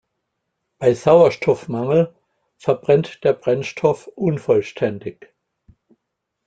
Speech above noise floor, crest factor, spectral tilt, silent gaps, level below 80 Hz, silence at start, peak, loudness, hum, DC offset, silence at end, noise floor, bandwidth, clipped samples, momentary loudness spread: 60 dB; 18 dB; -7 dB/octave; none; -58 dBFS; 0.8 s; -2 dBFS; -19 LUFS; none; under 0.1%; 1.35 s; -78 dBFS; 8.8 kHz; under 0.1%; 11 LU